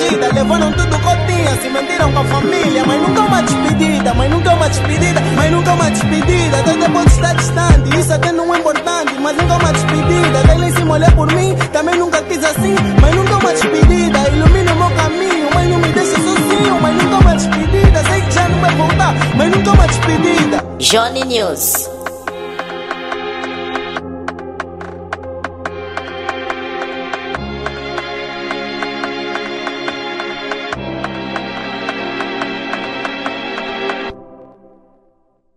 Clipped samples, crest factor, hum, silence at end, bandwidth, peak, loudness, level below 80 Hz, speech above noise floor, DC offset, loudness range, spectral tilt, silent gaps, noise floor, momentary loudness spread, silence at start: under 0.1%; 14 dB; none; 1.15 s; 14.5 kHz; 0 dBFS; -13 LUFS; -22 dBFS; 45 dB; under 0.1%; 11 LU; -5 dB/octave; none; -56 dBFS; 13 LU; 0 s